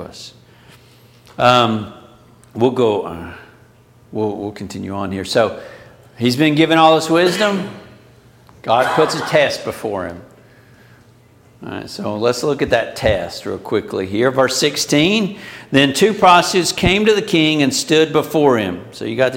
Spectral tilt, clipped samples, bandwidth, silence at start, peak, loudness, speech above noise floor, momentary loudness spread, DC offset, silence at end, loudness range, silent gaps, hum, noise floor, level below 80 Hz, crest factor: -4.5 dB/octave; under 0.1%; 17 kHz; 0 s; 0 dBFS; -16 LUFS; 32 dB; 18 LU; under 0.1%; 0 s; 9 LU; none; none; -48 dBFS; -44 dBFS; 16 dB